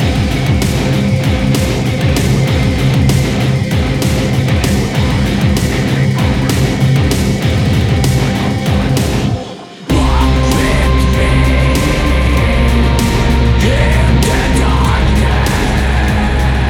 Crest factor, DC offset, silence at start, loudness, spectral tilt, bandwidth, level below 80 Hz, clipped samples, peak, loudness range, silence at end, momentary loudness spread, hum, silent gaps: 10 dB; under 0.1%; 0 s; -12 LUFS; -6 dB/octave; 16.5 kHz; -16 dBFS; under 0.1%; 0 dBFS; 2 LU; 0 s; 3 LU; none; none